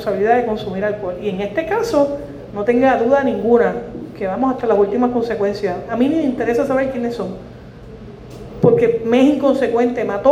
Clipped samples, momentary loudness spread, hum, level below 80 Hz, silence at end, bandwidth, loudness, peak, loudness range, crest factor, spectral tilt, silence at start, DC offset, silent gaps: under 0.1%; 17 LU; none; -44 dBFS; 0 s; 13.5 kHz; -17 LUFS; 0 dBFS; 3 LU; 16 dB; -7 dB/octave; 0 s; under 0.1%; none